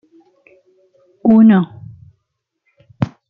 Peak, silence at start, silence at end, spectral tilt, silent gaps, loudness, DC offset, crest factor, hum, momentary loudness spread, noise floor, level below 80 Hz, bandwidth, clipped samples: -2 dBFS; 1.25 s; 0.2 s; -10.5 dB/octave; none; -13 LUFS; under 0.1%; 16 dB; none; 15 LU; -73 dBFS; -56 dBFS; 3.9 kHz; under 0.1%